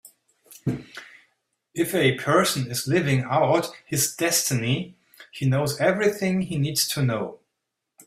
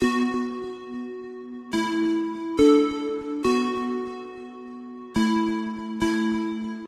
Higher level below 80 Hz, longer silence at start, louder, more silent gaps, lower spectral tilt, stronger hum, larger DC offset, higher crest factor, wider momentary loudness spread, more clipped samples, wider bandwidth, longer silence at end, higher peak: second, -58 dBFS vs -52 dBFS; about the same, 0.05 s vs 0 s; about the same, -23 LUFS vs -25 LUFS; neither; about the same, -4.5 dB/octave vs -5.5 dB/octave; neither; neither; about the same, 20 dB vs 18 dB; second, 13 LU vs 18 LU; neither; first, 16 kHz vs 13.5 kHz; first, 0.7 s vs 0 s; about the same, -6 dBFS vs -8 dBFS